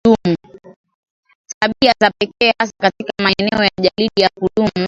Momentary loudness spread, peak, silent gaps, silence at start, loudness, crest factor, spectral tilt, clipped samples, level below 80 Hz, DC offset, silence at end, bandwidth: 6 LU; 0 dBFS; 0.76-0.84 s, 0.94-1.03 s, 1.10-1.23 s, 1.35-1.44 s, 1.54-1.61 s; 0.05 s; -16 LUFS; 16 dB; -5 dB/octave; under 0.1%; -48 dBFS; under 0.1%; 0 s; 7.8 kHz